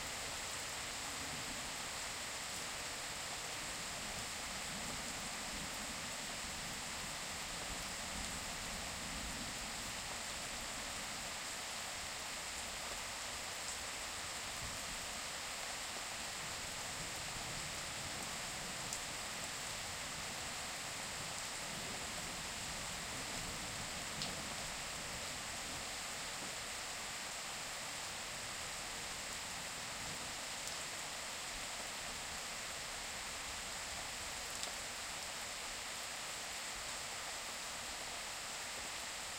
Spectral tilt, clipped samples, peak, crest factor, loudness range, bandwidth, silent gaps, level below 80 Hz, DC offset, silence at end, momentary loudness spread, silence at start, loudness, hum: -1 dB/octave; under 0.1%; -22 dBFS; 24 dB; 1 LU; 16 kHz; none; -60 dBFS; under 0.1%; 0 s; 1 LU; 0 s; -42 LUFS; none